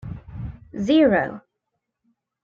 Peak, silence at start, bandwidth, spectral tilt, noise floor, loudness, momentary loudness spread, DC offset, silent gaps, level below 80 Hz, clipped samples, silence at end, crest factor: -6 dBFS; 0.05 s; 7.2 kHz; -7 dB/octave; -79 dBFS; -20 LUFS; 20 LU; under 0.1%; none; -46 dBFS; under 0.1%; 1.05 s; 18 dB